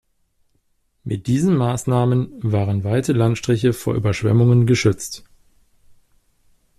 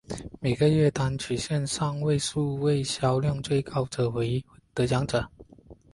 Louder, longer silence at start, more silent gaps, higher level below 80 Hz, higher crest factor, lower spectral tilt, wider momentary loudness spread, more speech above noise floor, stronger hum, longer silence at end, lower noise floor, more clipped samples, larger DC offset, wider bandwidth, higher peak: first, -19 LUFS vs -27 LUFS; first, 1.05 s vs 0.1 s; neither; about the same, -48 dBFS vs -50 dBFS; about the same, 16 dB vs 16 dB; about the same, -7 dB/octave vs -6 dB/octave; first, 12 LU vs 7 LU; first, 47 dB vs 26 dB; neither; first, 1.6 s vs 0.2 s; first, -65 dBFS vs -52 dBFS; neither; neither; first, 13.5 kHz vs 11.5 kHz; first, -4 dBFS vs -10 dBFS